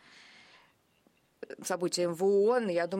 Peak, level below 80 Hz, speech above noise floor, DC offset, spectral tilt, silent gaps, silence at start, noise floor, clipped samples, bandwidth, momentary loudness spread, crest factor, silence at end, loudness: -18 dBFS; -82 dBFS; 41 dB; under 0.1%; -4.5 dB/octave; none; 1.5 s; -69 dBFS; under 0.1%; 16 kHz; 19 LU; 14 dB; 0 s; -29 LUFS